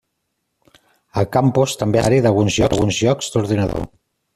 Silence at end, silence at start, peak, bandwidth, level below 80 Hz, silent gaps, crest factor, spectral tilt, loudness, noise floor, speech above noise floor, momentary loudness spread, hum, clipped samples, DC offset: 0.5 s; 1.15 s; -2 dBFS; 14 kHz; -40 dBFS; none; 16 dB; -5.5 dB/octave; -17 LUFS; -73 dBFS; 57 dB; 8 LU; none; under 0.1%; under 0.1%